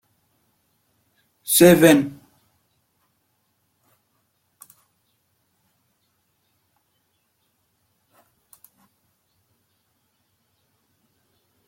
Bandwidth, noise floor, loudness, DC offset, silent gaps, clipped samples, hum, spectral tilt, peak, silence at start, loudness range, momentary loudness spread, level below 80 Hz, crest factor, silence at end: 16.5 kHz; -70 dBFS; -15 LUFS; under 0.1%; none; under 0.1%; none; -4.5 dB/octave; -2 dBFS; 1.5 s; 4 LU; 21 LU; -62 dBFS; 24 dB; 9.6 s